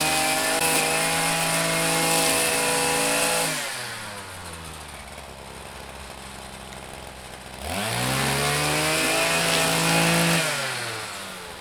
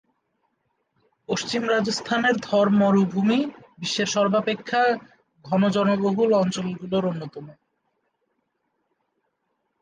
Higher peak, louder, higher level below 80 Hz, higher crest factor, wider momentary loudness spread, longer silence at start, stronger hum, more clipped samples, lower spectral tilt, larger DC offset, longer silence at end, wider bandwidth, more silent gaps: first, -4 dBFS vs -8 dBFS; about the same, -21 LUFS vs -22 LUFS; first, -48 dBFS vs -66 dBFS; about the same, 20 dB vs 16 dB; first, 18 LU vs 10 LU; second, 0 s vs 1.3 s; neither; neither; second, -2.5 dB/octave vs -5 dB/octave; neither; second, 0 s vs 2.3 s; first, over 20 kHz vs 9.6 kHz; neither